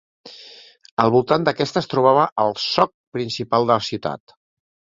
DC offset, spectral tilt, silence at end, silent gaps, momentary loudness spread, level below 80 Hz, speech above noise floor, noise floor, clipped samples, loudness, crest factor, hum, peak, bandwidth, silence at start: under 0.1%; -5.5 dB/octave; 0.8 s; 0.91-0.97 s, 2.32-2.36 s, 2.94-3.12 s; 14 LU; -58 dBFS; 26 dB; -45 dBFS; under 0.1%; -19 LUFS; 20 dB; none; 0 dBFS; 7.6 kHz; 0.25 s